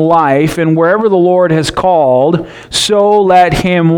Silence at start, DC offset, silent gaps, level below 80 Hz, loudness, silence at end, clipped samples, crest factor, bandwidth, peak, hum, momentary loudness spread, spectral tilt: 0 s; under 0.1%; none; -36 dBFS; -10 LUFS; 0 s; under 0.1%; 8 dB; 17 kHz; 0 dBFS; none; 5 LU; -5.5 dB/octave